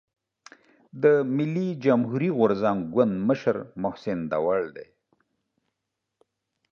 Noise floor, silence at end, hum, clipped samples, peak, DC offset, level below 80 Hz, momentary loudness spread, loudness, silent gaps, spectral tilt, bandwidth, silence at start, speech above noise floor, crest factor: -83 dBFS; 1.9 s; none; under 0.1%; -8 dBFS; under 0.1%; -64 dBFS; 9 LU; -25 LUFS; none; -8.5 dB/octave; 6.8 kHz; 0.95 s; 59 dB; 20 dB